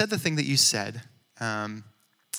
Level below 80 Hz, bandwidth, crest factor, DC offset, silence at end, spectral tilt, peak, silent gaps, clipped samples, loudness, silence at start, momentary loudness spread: -74 dBFS; over 20 kHz; 22 dB; under 0.1%; 0 s; -2.5 dB/octave; -8 dBFS; none; under 0.1%; -25 LUFS; 0 s; 19 LU